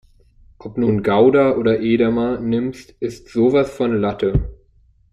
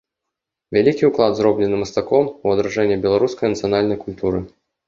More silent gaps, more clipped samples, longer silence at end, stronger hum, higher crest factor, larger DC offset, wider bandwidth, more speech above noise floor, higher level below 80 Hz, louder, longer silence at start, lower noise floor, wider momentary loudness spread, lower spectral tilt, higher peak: neither; neither; first, 0.6 s vs 0.4 s; neither; about the same, 16 dB vs 18 dB; neither; first, 11 kHz vs 7.4 kHz; second, 37 dB vs 64 dB; first, -36 dBFS vs -48 dBFS; about the same, -18 LUFS vs -18 LUFS; about the same, 0.65 s vs 0.7 s; second, -54 dBFS vs -82 dBFS; first, 14 LU vs 7 LU; first, -8 dB/octave vs -6.5 dB/octave; about the same, -2 dBFS vs -2 dBFS